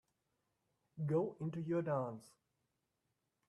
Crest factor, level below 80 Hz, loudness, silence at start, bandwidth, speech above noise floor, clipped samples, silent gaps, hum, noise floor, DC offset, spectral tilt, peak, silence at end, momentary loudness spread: 18 dB; -80 dBFS; -40 LUFS; 0.95 s; 11.5 kHz; 47 dB; under 0.1%; none; none; -86 dBFS; under 0.1%; -9.5 dB/octave; -24 dBFS; 1.2 s; 13 LU